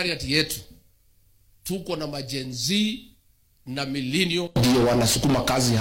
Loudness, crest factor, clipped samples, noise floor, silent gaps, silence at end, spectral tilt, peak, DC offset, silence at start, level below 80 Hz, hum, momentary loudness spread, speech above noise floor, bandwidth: -23 LUFS; 20 dB; under 0.1%; -60 dBFS; none; 0 s; -4 dB/octave; -6 dBFS; under 0.1%; 0 s; -44 dBFS; none; 13 LU; 37 dB; 16.5 kHz